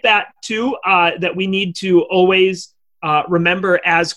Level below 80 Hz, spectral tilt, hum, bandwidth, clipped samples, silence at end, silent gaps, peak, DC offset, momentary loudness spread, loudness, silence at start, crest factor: -58 dBFS; -5 dB/octave; none; 11 kHz; under 0.1%; 0.05 s; none; -2 dBFS; under 0.1%; 8 LU; -15 LUFS; 0.05 s; 14 dB